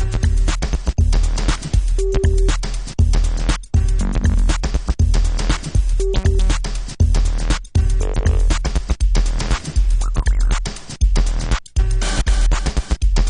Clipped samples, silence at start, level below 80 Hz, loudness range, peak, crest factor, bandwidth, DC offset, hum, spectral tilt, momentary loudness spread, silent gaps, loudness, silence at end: under 0.1%; 0 s; -16 dBFS; 1 LU; -4 dBFS; 12 dB; 10.5 kHz; under 0.1%; none; -5 dB/octave; 4 LU; none; -20 LUFS; 0 s